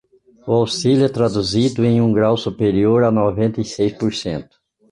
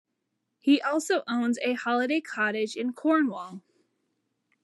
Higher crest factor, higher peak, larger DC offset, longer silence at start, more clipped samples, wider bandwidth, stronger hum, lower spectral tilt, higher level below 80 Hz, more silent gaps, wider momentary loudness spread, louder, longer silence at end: about the same, 14 dB vs 18 dB; first, -4 dBFS vs -10 dBFS; neither; second, 0.45 s vs 0.65 s; neither; about the same, 11.5 kHz vs 12 kHz; neither; first, -6.5 dB/octave vs -3.5 dB/octave; first, -46 dBFS vs under -90 dBFS; neither; about the same, 7 LU vs 7 LU; first, -17 LUFS vs -27 LUFS; second, 0.5 s vs 1.05 s